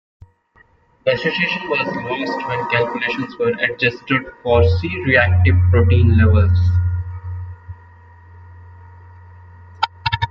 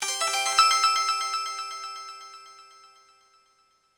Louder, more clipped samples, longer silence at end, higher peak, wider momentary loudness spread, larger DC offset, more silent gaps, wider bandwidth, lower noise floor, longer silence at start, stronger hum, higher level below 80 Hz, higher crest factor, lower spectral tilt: first, -17 LUFS vs -23 LUFS; neither; second, 0 s vs 1.35 s; first, -2 dBFS vs -6 dBFS; second, 11 LU vs 23 LU; neither; neither; second, 5.8 kHz vs over 20 kHz; second, -54 dBFS vs -66 dBFS; first, 1.05 s vs 0 s; neither; first, -38 dBFS vs -72 dBFS; second, 16 dB vs 22 dB; first, -8 dB/octave vs 3.5 dB/octave